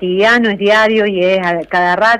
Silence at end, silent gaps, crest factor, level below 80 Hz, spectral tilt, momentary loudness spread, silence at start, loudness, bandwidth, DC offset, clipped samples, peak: 0 s; none; 10 dB; -48 dBFS; -5 dB/octave; 4 LU; 0 s; -12 LUFS; 12.5 kHz; under 0.1%; under 0.1%; -2 dBFS